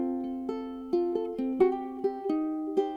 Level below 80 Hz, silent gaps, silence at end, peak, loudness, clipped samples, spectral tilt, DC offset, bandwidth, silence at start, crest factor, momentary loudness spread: -62 dBFS; none; 0 s; -14 dBFS; -30 LUFS; under 0.1%; -7.5 dB/octave; under 0.1%; 6.6 kHz; 0 s; 16 dB; 8 LU